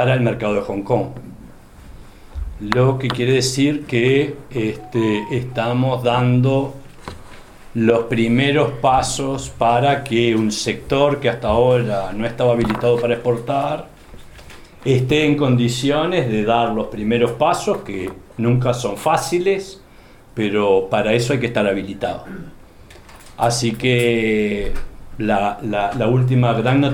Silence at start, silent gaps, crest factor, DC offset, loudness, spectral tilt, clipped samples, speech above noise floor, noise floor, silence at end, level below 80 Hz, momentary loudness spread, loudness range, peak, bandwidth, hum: 0 s; none; 18 dB; under 0.1%; -18 LUFS; -6 dB/octave; under 0.1%; 27 dB; -44 dBFS; 0 s; -38 dBFS; 11 LU; 3 LU; 0 dBFS; 15.5 kHz; none